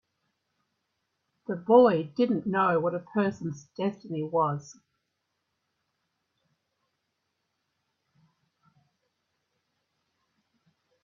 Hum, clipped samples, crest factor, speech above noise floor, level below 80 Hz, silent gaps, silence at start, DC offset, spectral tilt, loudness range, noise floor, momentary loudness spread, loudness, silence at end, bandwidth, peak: none; under 0.1%; 26 dB; 55 dB; -74 dBFS; none; 1.5 s; under 0.1%; -7.5 dB/octave; 10 LU; -80 dBFS; 17 LU; -26 LUFS; 6.3 s; 7.2 kHz; -6 dBFS